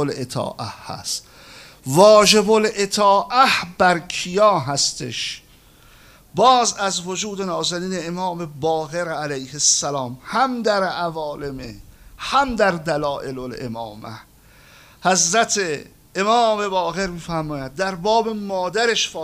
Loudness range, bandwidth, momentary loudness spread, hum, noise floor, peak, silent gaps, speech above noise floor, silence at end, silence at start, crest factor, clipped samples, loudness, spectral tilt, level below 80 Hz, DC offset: 7 LU; 16 kHz; 15 LU; none; -49 dBFS; 0 dBFS; none; 30 dB; 0 s; 0 s; 20 dB; under 0.1%; -19 LUFS; -3 dB/octave; -50 dBFS; under 0.1%